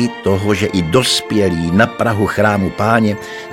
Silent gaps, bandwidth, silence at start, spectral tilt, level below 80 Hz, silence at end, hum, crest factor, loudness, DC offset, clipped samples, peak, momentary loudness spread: none; 16.5 kHz; 0 s; -5 dB/octave; -42 dBFS; 0 s; none; 14 dB; -15 LUFS; 0.3%; under 0.1%; 0 dBFS; 3 LU